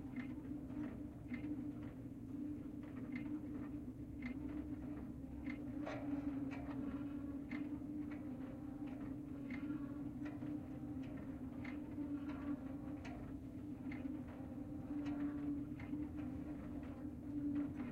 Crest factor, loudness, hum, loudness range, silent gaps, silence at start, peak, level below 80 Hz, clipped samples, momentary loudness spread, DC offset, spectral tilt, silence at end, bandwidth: 14 dB; -47 LUFS; none; 2 LU; none; 0 s; -32 dBFS; -62 dBFS; under 0.1%; 6 LU; under 0.1%; -8.5 dB/octave; 0 s; 10 kHz